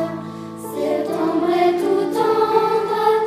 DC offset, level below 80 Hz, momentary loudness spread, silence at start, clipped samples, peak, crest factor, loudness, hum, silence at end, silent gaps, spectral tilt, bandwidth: under 0.1%; -64 dBFS; 13 LU; 0 s; under 0.1%; -2 dBFS; 16 dB; -19 LUFS; none; 0 s; none; -6 dB/octave; 15.5 kHz